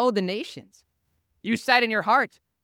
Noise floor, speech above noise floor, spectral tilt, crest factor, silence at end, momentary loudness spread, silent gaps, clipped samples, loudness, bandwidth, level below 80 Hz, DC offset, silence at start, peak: -73 dBFS; 49 dB; -4.5 dB/octave; 22 dB; 0.4 s; 14 LU; none; under 0.1%; -23 LUFS; 17.5 kHz; -74 dBFS; under 0.1%; 0 s; -2 dBFS